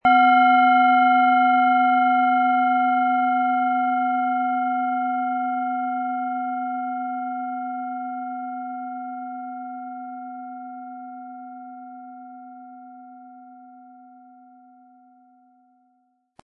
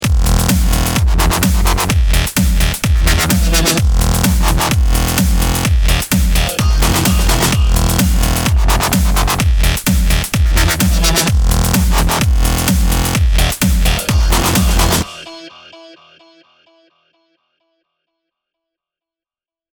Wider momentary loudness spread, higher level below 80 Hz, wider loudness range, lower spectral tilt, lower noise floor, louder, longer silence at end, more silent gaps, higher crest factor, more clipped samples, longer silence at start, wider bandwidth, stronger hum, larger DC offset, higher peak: first, 23 LU vs 2 LU; second, -72 dBFS vs -16 dBFS; first, 23 LU vs 3 LU; first, -7 dB/octave vs -4 dB/octave; second, -67 dBFS vs under -90 dBFS; second, -21 LUFS vs -13 LUFS; second, 2.65 s vs 4 s; neither; about the same, 16 dB vs 12 dB; neither; about the same, 0.05 s vs 0 s; second, 4.3 kHz vs over 20 kHz; neither; neither; second, -6 dBFS vs 0 dBFS